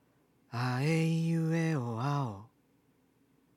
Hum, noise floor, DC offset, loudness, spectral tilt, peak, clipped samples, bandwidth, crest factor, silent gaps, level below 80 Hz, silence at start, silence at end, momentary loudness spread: none; -70 dBFS; under 0.1%; -32 LUFS; -7 dB/octave; -18 dBFS; under 0.1%; 12 kHz; 16 dB; none; -80 dBFS; 0.5 s; 1.1 s; 10 LU